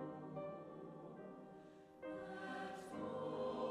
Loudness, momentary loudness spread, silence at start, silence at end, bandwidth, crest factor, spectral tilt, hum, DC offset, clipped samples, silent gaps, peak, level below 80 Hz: -49 LUFS; 13 LU; 0 s; 0 s; 13 kHz; 16 dB; -6.5 dB/octave; none; under 0.1%; under 0.1%; none; -34 dBFS; -80 dBFS